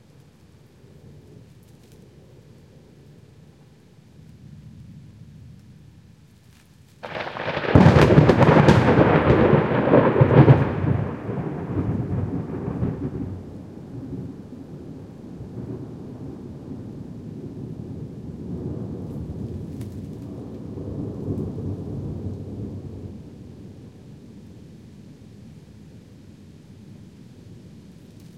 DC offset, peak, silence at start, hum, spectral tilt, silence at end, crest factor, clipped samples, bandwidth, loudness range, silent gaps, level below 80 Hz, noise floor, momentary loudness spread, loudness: under 0.1%; 0 dBFS; 1.15 s; none; -8.5 dB/octave; 0 s; 24 dB; under 0.1%; 9 kHz; 21 LU; none; -42 dBFS; -51 dBFS; 27 LU; -20 LUFS